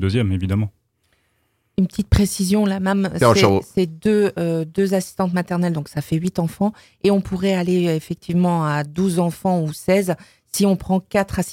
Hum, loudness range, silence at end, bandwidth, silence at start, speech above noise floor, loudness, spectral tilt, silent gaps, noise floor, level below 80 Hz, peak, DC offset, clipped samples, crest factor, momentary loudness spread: none; 3 LU; 0 s; 16.5 kHz; 0 s; 48 dB; -20 LUFS; -6 dB/octave; none; -67 dBFS; -38 dBFS; 0 dBFS; under 0.1%; under 0.1%; 18 dB; 6 LU